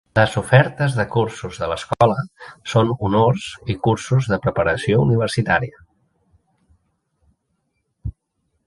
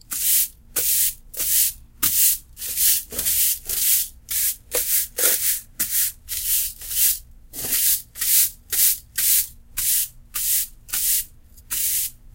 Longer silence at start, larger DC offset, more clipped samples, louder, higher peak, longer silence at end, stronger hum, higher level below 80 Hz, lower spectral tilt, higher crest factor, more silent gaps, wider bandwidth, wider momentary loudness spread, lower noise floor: about the same, 0.15 s vs 0.1 s; neither; neither; about the same, -19 LUFS vs -19 LUFS; about the same, 0 dBFS vs -2 dBFS; first, 0.55 s vs 0.05 s; neither; about the same, -44 dBFS vs -46 dBFS; first, -6.5 dB/octave vs 1.5 dB/octave; about the same, 20 dB vs 20 dB; neither; second, 11.5 kHz vs 17 kHz; first, 16 LU vs 8 LU; first, -71 dBFS vs -43 dBFS